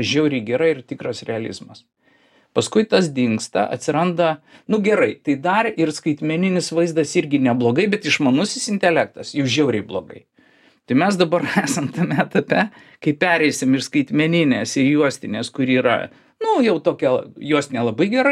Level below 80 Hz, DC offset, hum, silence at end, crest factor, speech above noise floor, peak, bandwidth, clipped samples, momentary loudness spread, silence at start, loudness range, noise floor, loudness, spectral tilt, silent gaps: -64 dBFS; under 0.1%; none; 0 s; 18 dB; 38 dB; -2 dBFS; 13 kHz; under 0.1%; 8 LU; 0 s; 3 LU; -57 dBFS; -19 LUFS; -5 dB/octave; none